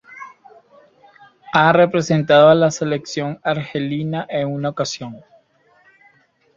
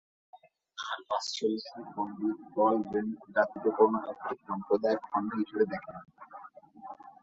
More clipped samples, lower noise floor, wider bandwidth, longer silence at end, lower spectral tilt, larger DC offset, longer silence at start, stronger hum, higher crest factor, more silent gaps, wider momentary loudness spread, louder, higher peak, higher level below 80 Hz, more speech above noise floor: neither; first, -57 dBFS vs -50 dBFS; about the same, 7.6 kHz vs 8 kHz; first, 1.4 s vs 0.1 s; about the same, -5.5 dB/octave vs -5 dB/octave; neither; second, 0.1 s vs 0.35 s; neither; about the same, 18 dB vs 22 dB; neither; second, 18 LU vs 22 LU; first, -17 LUFS vs -31 LUFS; first, -2 dBFS vs -10 dBFS; first, -58 dBFS vs -74 dBFS; first, 40 dB vs 19 dB